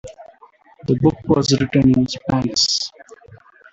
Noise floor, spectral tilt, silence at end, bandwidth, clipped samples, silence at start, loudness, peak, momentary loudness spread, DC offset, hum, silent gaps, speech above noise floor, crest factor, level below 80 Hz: -49 dBFS; -5 dB/octave; 0.35 s; 8.2 kHz; under 0.1%; 0.05 s; -17 LUFS; -2 dBFS; 7 LU; under 0.1%; none; none; 33 dB; 16 dB; -46 dBFS